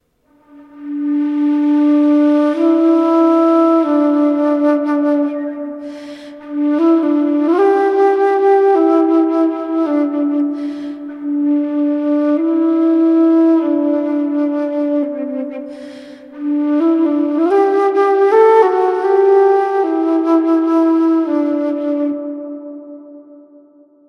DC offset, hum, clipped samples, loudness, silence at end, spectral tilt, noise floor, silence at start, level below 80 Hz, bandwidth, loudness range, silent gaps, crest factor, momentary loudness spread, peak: under 0.1%; none; under 0.1%; -14 LUFS; 0.75 s; -6 dB/octave; -54 dBFS; 0.55 s; -70 dBFS; 6 kHz; 5 LU; none; 14 dB; 15 LU; 0 dBFS